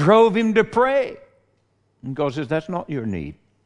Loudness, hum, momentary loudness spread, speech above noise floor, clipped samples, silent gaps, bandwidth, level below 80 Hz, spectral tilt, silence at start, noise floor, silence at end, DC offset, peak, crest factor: -21 LUFS; none; 17 LU; 46 dB; under 0.1%; none; 10.5 kHz; -54 dBFS; -7 dB/octave; 0 s; -65 dBFS; 0.35 s; under 0.1%; -2 dBFS; 18 dB